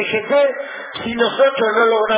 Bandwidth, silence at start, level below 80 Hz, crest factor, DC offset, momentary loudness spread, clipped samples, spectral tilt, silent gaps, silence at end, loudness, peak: 4 kHz; 0 s; -56 dBFS; 14 dB; under 0.1%; 12 LU; under 0.1%; -7.5 dB/octave; none; 0 s; -16 LUFS; -2 dBFS